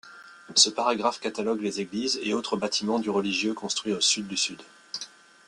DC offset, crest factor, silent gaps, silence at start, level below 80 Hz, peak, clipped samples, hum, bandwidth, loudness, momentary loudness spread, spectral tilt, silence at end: under 0.1%; 24 dB; none; 0.05 s; -70 dBFS; -4 dBFS; under 0.1%; none; 12 kHz; -25 LUFS; 16 LU; -2 dB/octave; 0.4 s